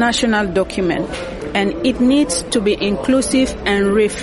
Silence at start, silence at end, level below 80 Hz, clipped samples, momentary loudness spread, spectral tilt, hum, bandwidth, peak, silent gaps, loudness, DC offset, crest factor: 0 s; 0 s; -36 dBFS; under 0.1%; 5 LU; -4 dB/octave; none; 11.5 kHz; -4 dBFS; none; -17 LUFS; under 0.1%; 12 dB